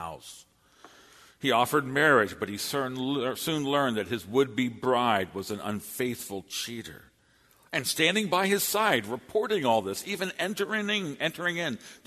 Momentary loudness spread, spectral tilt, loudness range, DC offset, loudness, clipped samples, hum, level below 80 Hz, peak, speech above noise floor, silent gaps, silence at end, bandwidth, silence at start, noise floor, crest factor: 10 LU; -3.5 dB/octave; 4 LU; under 0.1%; -28 LUFS; under 0.1%; none; -66 dBFS; -8 dBFS; 35 dB; none; 0.1 s; 13.5 kHz; 0 s; -63 dBFS; 20 dB